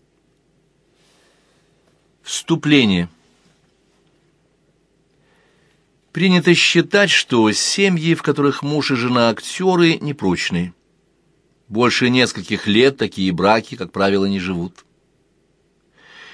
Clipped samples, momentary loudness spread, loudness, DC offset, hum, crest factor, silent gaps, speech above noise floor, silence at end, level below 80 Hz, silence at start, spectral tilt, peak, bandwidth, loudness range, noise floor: under 0.1%; 12 LU; -16 LUFS; under 0.1%; none; 20 dB; none; 45 dB; 0.1 s; -56 dBFS; 2.25 s; -4.5 dB/octave; 0 dBFS; 11 kHz; 6 LU; -61 dBFS